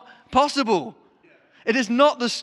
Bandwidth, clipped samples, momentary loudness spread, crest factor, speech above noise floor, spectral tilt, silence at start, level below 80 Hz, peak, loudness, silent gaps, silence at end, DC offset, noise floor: 12 kHz; under 0.1%; 9 LU; 18 dB; 36 dB; -3.5 dB/octave; 0.3 s; -56 dBFS; -4 dBFS; -21 LUFS; none; 0 s; under 0.1%; -56 dBFS